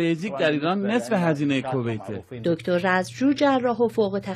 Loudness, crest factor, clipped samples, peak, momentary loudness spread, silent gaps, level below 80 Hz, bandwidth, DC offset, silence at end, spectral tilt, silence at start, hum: -23 LUFS; 16 dB; under 0.1%; -6 dBFS; 7 LU; none; -66 dBFS; 13 kHz; under 0.1%; 0 s; -6.5 dB/octave; 0 s; none